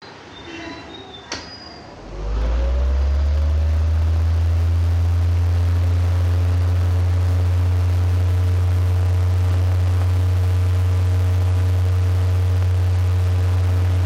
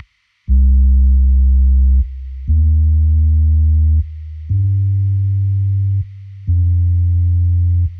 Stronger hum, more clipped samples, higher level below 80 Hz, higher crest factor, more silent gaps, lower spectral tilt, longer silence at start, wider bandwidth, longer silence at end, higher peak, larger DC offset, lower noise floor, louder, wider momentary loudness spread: neither; neither; second, -26 dBFS vs -14 dBFS; about the same, 4 dB vs 8 dB; neither; second, -7 dB/octave vs -12 dB/octave; second, 0 s vs 0.5 s; first, 7.4 kHz vs 0.3 kHz; about the same, 0 s vs 0 s; second, -12 dBFS vs -4 dBFS; neither; first, -37 dBFS vs -32 dBFS; second, -19 LUFS vs -15 LUFS; first, 13 LU vs 8 LU